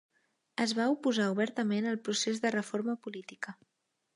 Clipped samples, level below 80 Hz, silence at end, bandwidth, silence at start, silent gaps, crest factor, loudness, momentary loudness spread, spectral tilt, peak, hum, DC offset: under 0.1%; -84 dBFS; 0.6 s; 11.5 kHz; 0.6 s; none; 18 dB; -32 LUFS; 13 LU; -4 dB/octave; -16 dBFS; none; under 0.1%